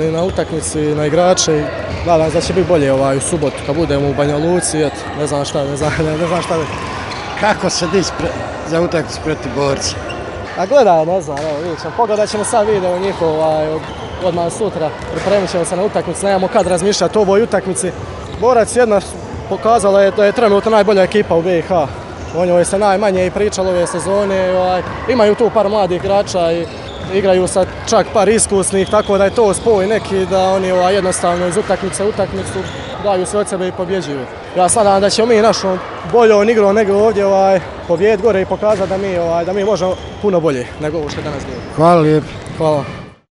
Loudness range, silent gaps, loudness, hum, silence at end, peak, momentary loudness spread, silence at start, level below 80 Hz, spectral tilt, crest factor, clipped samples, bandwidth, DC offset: 5 LU; none; -14 LUFS; none; 0.2 s; 0 dBFS; 10 LU; 0 s; -38 dBFS; -4.5 dB/octave; 14 dB; under 0.1%; 11.5 kHz; under 0.1%